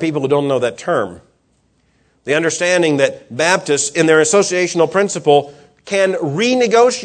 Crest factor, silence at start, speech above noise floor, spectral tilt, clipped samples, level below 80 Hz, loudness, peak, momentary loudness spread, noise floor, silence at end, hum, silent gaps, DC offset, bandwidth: 16 dB; 0 s; 45 dB; -3.5 dB/octave; under 0.1%; -62 dBFS; -15 LUFS; 0 dBFS; 7 LU; -60 dBFS; 0 s; none; none; under 0.1%; 11 kHz